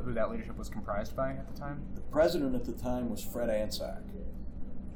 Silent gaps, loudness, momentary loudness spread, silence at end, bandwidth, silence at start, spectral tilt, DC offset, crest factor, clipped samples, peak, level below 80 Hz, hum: none; -35 LUFS; 16 LU; 0 s; 19.5 kHz; 0 s; -6 dB/octave; under 0.1%; 18 dB; under 0.1%; -16 dBFS; -42 dBFS; none